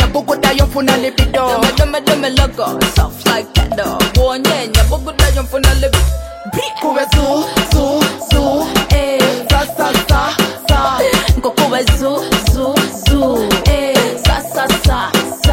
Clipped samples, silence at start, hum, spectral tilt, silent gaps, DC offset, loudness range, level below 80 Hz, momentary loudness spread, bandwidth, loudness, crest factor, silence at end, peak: under 0.1%; 0 s; none; -4.5 dB/octave; none; under 0.1%; 1 LU; -18 dBFS; 3 LU; 16.5 kHz; -13 LUFS; 12 dB; 0 s; 0 dBFS